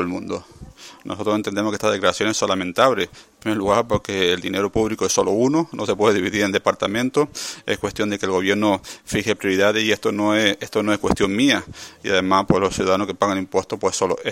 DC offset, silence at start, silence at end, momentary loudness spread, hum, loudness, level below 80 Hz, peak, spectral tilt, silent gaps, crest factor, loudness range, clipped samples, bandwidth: under 0.1%; 0 s; 0 s; 8 LU; none; -20 LUFS; -48 dBFS; 0 dBFS; -4 dB/octave; none; 20 dB; 2 LU; under 0.1%; 16.5 kHz